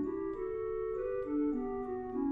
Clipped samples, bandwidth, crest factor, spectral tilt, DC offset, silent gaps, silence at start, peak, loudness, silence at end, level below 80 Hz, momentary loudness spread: under 0.1%; 3.5 kHz; 10 dB; -10 dB/octave; under 0.1%; none; 0 s; -24 dBFS; -37 LUFS; 0 s; -56 dBFS; 4 LU